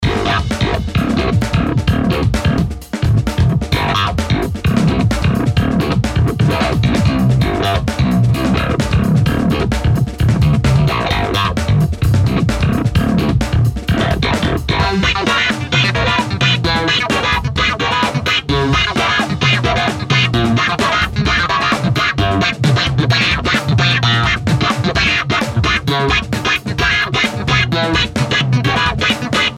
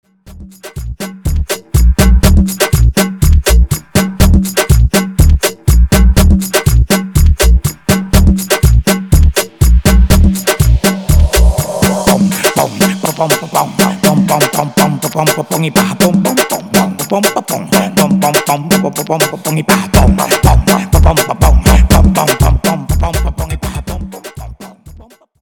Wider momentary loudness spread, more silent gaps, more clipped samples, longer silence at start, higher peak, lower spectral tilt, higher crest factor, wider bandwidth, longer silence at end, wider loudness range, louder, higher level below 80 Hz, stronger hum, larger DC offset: second, 3 LU vs 8 LU; neither; neither; second, 0 s vs 0.25 s; about the same, 0 dBFS vs 0 dBFS; about the same, -5.5 dB/octave vs -5 dB/octave; about the same, 14 dB vs 10 dB; second, 15.5 kHz vs over 20 kHz; second, 0 s vs 0.45 s; about the same, 2 LU vs 2 LU; second, -14 LUFS vs -11 LUFS; second, -26 dBFS vs -14 dBFS; neither; neither